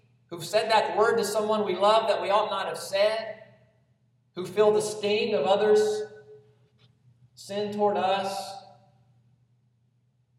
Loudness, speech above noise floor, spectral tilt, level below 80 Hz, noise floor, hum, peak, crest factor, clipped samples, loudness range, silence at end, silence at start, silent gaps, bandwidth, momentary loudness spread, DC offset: -25 LUFS; 43 dB; -3.5 dB/octave; -78 dBFS; -68 dBFS; none; -8 dBFS; 18 dB; under 0.1%; 7 LU; 1.75 s; 0.3 s; none; 15 kHz; 18 LU; under 0.1%